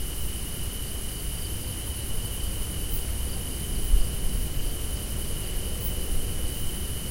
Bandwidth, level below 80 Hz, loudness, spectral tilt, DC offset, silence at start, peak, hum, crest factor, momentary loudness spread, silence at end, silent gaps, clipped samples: 16 kHz; -30 dBFS; -31 LUFS; -3.5 dB/octave; under 0.1%; 0 s; -8 dBFS; none; 18 dB; 4 LU; 0 s; none; under 0.1%